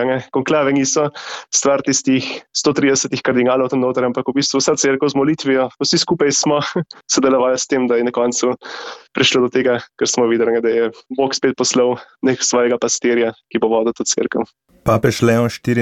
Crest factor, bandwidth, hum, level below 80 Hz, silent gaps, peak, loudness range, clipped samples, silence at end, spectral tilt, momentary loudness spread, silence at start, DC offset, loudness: 14 dB; 14 kHz; none; -52 dBFS; none; -2 dBFS; 1 LU; under 0.1%; 0 s; -3.5 dB/octave; 6 LU; 0 s; under 0.1%; -16 LUFS